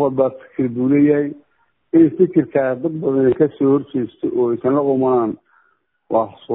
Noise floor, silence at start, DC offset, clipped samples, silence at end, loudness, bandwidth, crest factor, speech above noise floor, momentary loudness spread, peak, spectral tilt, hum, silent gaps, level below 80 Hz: -62 dBFS; 0 s; under 0.1%; under 0.1%; 0 s; -17 LUFS; 3.9 kHz; 16 dB; 46 dB; 8 LU; -2 dBFS; -13 dB/octave; none; none; -58 dBFS